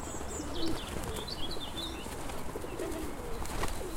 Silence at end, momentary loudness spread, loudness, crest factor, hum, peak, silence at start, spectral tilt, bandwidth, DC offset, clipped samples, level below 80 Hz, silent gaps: 0 s; 4 LU; -38 LUFS; 16 dB; none; -18 dBFS; 0 s; -4 dB/octave; 16 kHz; under 0.1%; under 0.1%; -44 dBFS; none